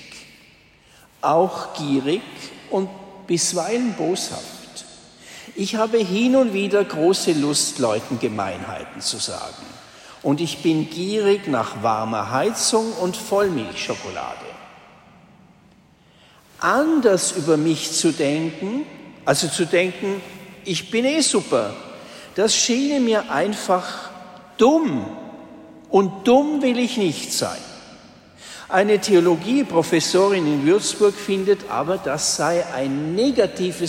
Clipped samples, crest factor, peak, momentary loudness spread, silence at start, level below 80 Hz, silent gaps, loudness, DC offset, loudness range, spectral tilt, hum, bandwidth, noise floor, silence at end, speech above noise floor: under 0.1%; 18 dB; -4 dBFS; 18 LU; 0 s; -60 dBFS; none; -20 LUFS; under 0.1%; 6 LU; -4 dB/octave; none; 16 kHz; -53 dBFS; 0 s; 33 dB